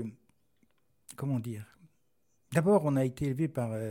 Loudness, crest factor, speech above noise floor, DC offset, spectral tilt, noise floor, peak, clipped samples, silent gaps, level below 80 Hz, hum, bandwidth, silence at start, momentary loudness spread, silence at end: -31 LUFS; 20 dB; 48 dB; under 0.1%; -8 dB/octave; -78 dBFS; -14 dBFS; under 0.1%; none; -62 dBFS; none; 17 kHz; 0 s; 17 LU; 0 s